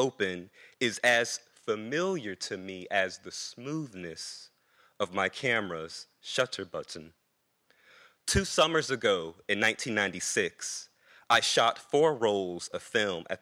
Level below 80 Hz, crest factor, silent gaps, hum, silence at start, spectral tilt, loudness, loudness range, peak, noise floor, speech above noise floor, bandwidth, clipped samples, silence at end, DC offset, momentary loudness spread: -54 dBFS; 20 dB; none; none; 0 s; -3 dB/octave; -30 LUFS; 6 LU; -12 dBFS; -75 dBFS; 45 dB; 16.5 kHz; under 0.1%; 0.05 s; under 0.1%; 14 LU